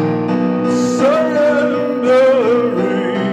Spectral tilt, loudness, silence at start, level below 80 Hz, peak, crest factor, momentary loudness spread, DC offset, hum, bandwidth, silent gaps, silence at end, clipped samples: -6.5 dB/octave; -14 LUFS; 0 s; -58 dBFS; -2 dBFS; 12 dB; 5 LU; under 0.1%; none; 10 kHz; none; 0 s; under 0.1%